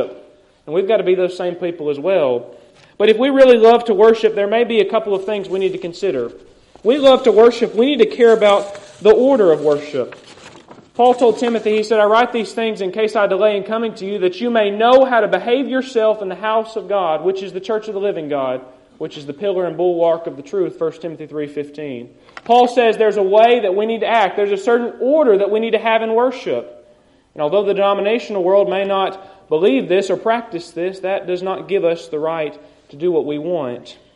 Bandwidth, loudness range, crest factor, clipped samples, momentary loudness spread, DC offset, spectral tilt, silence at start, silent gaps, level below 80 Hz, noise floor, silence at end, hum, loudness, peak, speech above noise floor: 10.5 kHz; 7 LU; 16 dB; under 0.1%; 13 LU; under 0.1%; -5.5 dB/octave; 0 s; none; -60 dBFS; -51 dBFS; 0.2 s; none; -16 LUFS; 0 dBFS; 36 dB